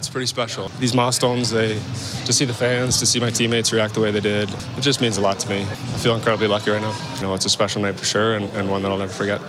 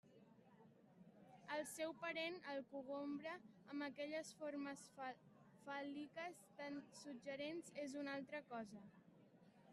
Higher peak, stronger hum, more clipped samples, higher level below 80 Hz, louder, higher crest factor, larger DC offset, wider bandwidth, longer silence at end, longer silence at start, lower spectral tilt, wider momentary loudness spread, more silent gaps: first, -4 dBFS vs -34 dBFS; neither; neither; first, -52 dBFS vs under -90 dBFS; first, -20 LUFS vs -51 LUFS; about the same, 16 dB vs 18 dB; neither; first, 15.5 kHz vs 13 kHz; about the same, 0 s vs 0 s; about the same, 0 s vs 0.05 s; about the same, -3.5 dB/octave vs -3.5 dB/octave; second, 7 LU vs 21 LU; neither